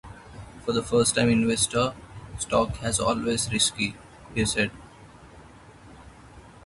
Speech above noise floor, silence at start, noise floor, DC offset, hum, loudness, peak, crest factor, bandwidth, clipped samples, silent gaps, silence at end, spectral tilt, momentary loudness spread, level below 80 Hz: 24 dB; 0.05 s; -49 dBFS; under 0.1%; none; -25 LUFS; -6 dBFS; 20 dB; 12 kHz; under 0.1%; none; 0.05 s; -3.5 dB/octave; 21 LU; -48 dBFS